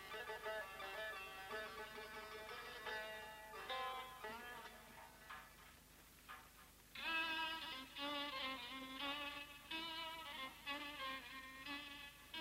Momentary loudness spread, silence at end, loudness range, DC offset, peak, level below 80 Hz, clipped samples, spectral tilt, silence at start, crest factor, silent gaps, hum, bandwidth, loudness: 14 LU; 0 s; 7 LU; under 0.1%; -32 dBFS; -72 dBFS; under 0.1%; -2 dB/octave; 0 s; 18 dB; none; none; 16 kHz; -48 LUFS